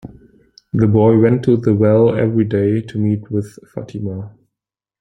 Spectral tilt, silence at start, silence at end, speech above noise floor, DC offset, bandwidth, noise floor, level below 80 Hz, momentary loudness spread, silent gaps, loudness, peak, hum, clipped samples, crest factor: -10 dB/octave; 0.05 s; 0.7 s; 70 dB; under 0.1%; 6.2 kHz; -84 dBFS; -48 dBFS; 17 LU; none; -15 LUFS; -2 dBFS; none; under 0.1%; 14 dB